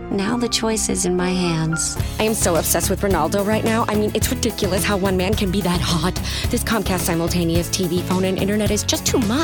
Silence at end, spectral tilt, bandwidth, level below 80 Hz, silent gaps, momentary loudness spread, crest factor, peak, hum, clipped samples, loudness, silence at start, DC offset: 0 s; -4.5 dB/octave; 19.5 kHz; -32 dBFS; none; 3 LU; 18 dB; -2 dBFS; none; under 0.1%; -19 LUFS; 0 s; under 0.1%